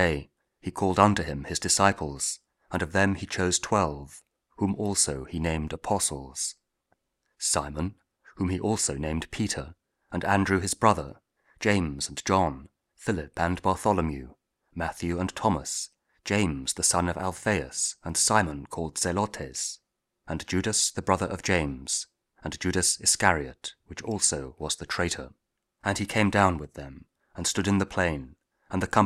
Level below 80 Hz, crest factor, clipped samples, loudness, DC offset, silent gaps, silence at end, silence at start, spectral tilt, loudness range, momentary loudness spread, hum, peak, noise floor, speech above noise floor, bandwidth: -48 dBFS; 26 dB; under 0.1%; -27 LUFS; under 0.1%; none; 0 s; 0 s; -3.5 dB/octave; 3 LU; 15 LU; none; -4 dBFS; -74 dBFS; 47 dB; 15.5 kHz